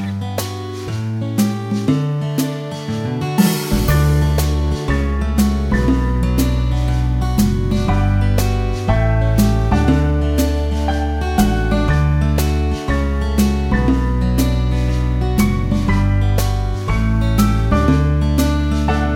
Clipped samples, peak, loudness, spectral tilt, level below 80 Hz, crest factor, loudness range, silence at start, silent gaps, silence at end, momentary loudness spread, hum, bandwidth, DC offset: under 0.1%; -2 dBFS; -17 LUFS; -6.5 dB/octave; -20 dBFS; 14 dB; 1 LU; 0 s; none; 0 s; 5 LU; none; 19 kHz; under 0.1%